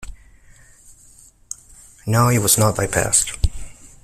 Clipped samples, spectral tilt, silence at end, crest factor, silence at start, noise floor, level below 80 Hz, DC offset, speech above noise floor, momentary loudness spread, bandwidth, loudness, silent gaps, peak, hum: under 0.1%; -4 dB/octave; 0.15 s; 20 dB; 0 s; -49 dBFS; -34 dBFS; under 0.1%; 32 dB; 20 LU; 16 kHz; -17 LUFS; none; -2 dBFS; none